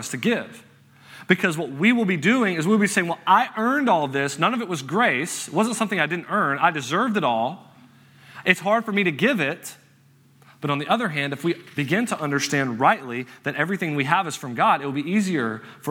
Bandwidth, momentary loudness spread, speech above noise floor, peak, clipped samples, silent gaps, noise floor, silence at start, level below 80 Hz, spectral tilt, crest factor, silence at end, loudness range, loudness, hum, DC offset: 17 kHz; 8 LU; 33 dB; 0 dBFS; under 0.1%; none; -56 dBFS; 0 s; -72 dBFS; -4.5 dB/octave; 22 dB; 0 s; 4 LU; -22 LUFS; none; under 0.1%